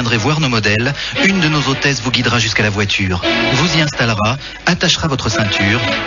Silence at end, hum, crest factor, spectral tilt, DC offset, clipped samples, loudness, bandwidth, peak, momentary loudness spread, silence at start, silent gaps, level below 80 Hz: 0 s; none; 14 dB; -3 dB/octave; under 0.1%; under 0.1%; -14 LUFS; 7.4 kHz; 0 dBFS; 3 LU; 0 s; none; -36 dBFS